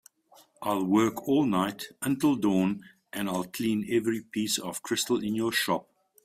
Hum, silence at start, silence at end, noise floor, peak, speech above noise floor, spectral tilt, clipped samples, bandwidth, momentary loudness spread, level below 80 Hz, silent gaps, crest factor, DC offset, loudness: none; 0.6 s; 0.4 s; -60 dBFS; -12 dBFS; 32 dB; -4.5 dB/octave; under 0.1%; 16 kHz; 8 LU; -66 dBFS; none; 16 dB; under 0.1%; -28 LUFS